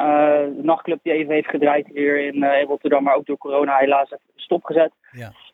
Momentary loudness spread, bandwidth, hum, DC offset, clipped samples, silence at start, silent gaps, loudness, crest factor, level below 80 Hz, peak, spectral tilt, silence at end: 8 LU; 4 kHz; none; under 0.1%; under 0.1%; 0 s; none; -19 LUFS; 16 dB; -72 dBFS; -4 dBFS; -7.5 dB/octave; 0.25 s